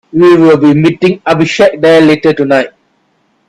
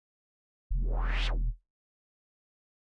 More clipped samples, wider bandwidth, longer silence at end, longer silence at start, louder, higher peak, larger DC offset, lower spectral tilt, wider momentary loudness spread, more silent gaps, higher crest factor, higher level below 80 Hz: first, 0.2% vs under 0.1%; first, 11 kHz vs 6.8 kHz; second, 0.8 s vs 1.4 s; second, 0.15 s vs 0.7 s; first, -7 LUFS vs -35 LUFS; first, 0 dBFS vs -20 dBFS; neither; about the same, -6.5 dB/octave vs -5.5 dB/octave; about the same, 6 LU vs 7 LU; neither; second, 8 dB vs 14 dB; second, -48 dBFS vs -34 dBFS